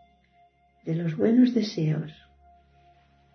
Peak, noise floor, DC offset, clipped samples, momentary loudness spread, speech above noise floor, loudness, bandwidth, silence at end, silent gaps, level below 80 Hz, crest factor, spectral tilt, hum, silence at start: -8 dBFS; -62 dBFS; under 0.1%; under 0.1%; 16 LU; 38 dB; -25 LUFS; 6.4 kHz; 1.2 s; none; -66 dBFS; 18 dB; -8 dB/octave; none; 0.85 s